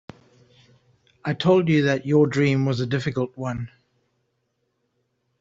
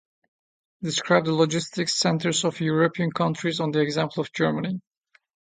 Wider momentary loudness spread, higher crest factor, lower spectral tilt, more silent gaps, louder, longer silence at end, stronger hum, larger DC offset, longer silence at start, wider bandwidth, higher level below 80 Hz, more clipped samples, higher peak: first, 13 LU vs 6 LU; about the same, 18 dB vs 20 dB; first, -7 dB/octave vs -4.5 dB/octave; neither; about the same, -22 LUFS vs -24 LUFS; first, 1.75 s vs 0.65 s; neither; neither; first, 1.25 s vs 0.8 s; second, 7.8 kHz vs 9.6 kHz; first, -58 dBFS vs -66 dBFS; neither; about the same, -6 dBFS vs -4 dBFS